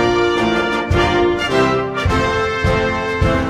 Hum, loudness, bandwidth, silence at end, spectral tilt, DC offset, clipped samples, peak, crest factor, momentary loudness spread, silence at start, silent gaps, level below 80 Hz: none; -16 LUFS; 13 kHz; 0 s; -6 dB/octave; under 0.1%; under 0.1%; -2 dBFS; 14 dB; 3 LU; 0 s; none; -28 dBFS